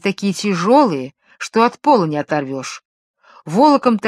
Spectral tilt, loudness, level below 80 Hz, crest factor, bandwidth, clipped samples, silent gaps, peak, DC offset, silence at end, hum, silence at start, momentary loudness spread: -5.5 dB/octave; -16 LUFS; -66 dBFS; 16 dB; 13 kHz; under 0.1%; 2.85-3.14 s; 0 dBFS; under 0.1%; 0 s; none; 0.05 s; 17 LU